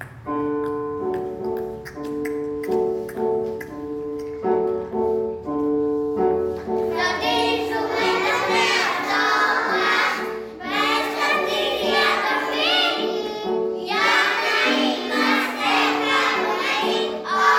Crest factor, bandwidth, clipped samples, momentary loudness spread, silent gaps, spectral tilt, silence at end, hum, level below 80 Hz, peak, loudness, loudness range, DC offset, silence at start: 18 dB; 17 kHz; under 0.1%; 9 LU; none; -3 dB/octave; 0 s; none; -54 dBFS; -4 dBFS; -21 LUFS; 7 LU; under 0.1%; 0 s